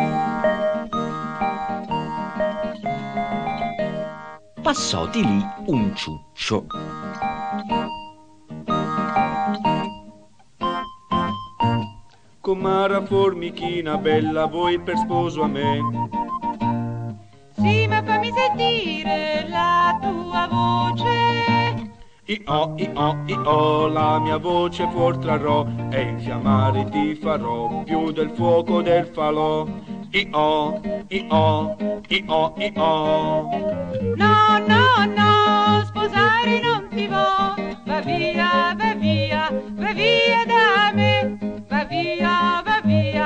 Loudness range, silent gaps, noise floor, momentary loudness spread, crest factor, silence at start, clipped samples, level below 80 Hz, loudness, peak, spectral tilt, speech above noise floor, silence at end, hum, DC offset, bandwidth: 8 LU; none; -51 dBFS; 11 LU; 18 dB; 0 s; under 0.1%; -48 dBFS; -21 LUFS; -4 dBFS; -6 dB/octave; 31 dB; 0 s; none; 0.3%; 9.2 kHz